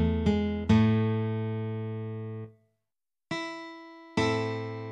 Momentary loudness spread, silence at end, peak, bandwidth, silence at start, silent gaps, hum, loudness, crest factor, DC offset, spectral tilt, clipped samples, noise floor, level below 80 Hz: 18 LU; 0 s; -12 dBFS; 9.2 kHz; 0 s; none; none; -29 LUFS; 18 dB; under 0.1%; -7.5 dB/octave; under 0.1%; under -90 dBFS; -46 dBFS